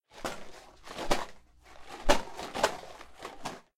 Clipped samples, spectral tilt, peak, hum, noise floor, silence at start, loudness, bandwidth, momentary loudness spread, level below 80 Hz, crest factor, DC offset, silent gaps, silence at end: under 0.1%; -3 dB/octave; -8 dBFS; none; -52 dBFS; 0.15 s; -34 LUFS; 16 kHz; 20 LU; -42 dBFS; 26 dB; under 0.1%; none; 0.2 s